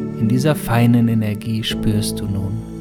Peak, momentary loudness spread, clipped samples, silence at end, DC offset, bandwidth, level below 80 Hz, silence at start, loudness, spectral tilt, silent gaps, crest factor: -4 dBFS; 8 LU; under 0.1%; 0 s; under 0.1%; 18 kHz; -36 dBFS; 0 s; -18 LUFS; -6.5 dB/octave; none; 14 dB